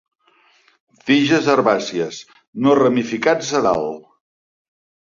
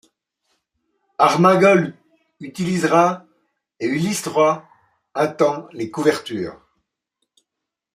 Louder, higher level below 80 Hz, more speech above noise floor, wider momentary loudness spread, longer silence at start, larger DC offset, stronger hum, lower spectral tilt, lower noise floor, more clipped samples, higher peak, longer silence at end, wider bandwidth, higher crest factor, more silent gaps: about the same, -17 LUFS vs -18 LUFS; first, -58 dBFS vs -64 dBFS; second, 40 dB vs 65 dB; about the same, 16 LU vs 18 LU; second, 1.05 s vs 1.2 s; neither; neither; about the same, -5 dB/octave vs -5.5 dB/octave; second, -57 dBFS vs -83 dBFS; neither; about the same, -2 dBFS vs -2 dBFS; second, 1.15 s vs 1.4 s; second, 7.4 kHz vs 15.5 kHz; about the same, 18 dB vs 20 dB; first, 2.48-2.53 s vs none